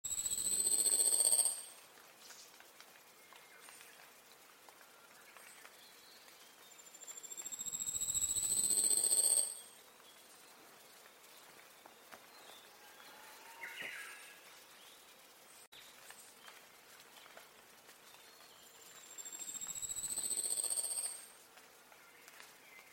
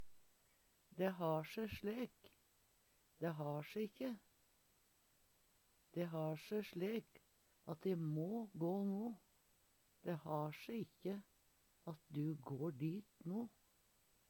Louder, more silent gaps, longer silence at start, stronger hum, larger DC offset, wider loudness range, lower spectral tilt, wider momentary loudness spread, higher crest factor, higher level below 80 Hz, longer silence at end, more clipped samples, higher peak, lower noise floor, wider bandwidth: first, -33 LUFS vs -46 LUFS; first, 15.67-15.72 s vs none; about the same, 0.05 s vs 0 s; neither; neither; first, 23 LU vs 5 LU; second, 1.5 dB/octave vs -7.5 dB/octave; first, 28 LU vs 10 LU; about the same, 24 dB vs 20 dB; about the same, -76 dBFS vs -80 dBFS; second, 0.05 s vs 0.8 s; neither; first, -18 dBFS vs -28 dBFS; second, -61 dBFS vs -77 dBFS; second, 16.5 kHz vs 19 kHz